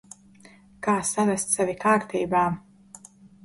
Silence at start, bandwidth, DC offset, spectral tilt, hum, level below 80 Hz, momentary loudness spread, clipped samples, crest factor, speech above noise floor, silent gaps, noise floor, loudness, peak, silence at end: 0.8 s; 12 kHz; under 0.1%; -4.5 dB/octave; none; -60 dBFS; 5 LU; under 0.1%; 18 dB; 29 dB; none; -52 dBFS; -24 LUFS; -10 dBFS; 0.85 s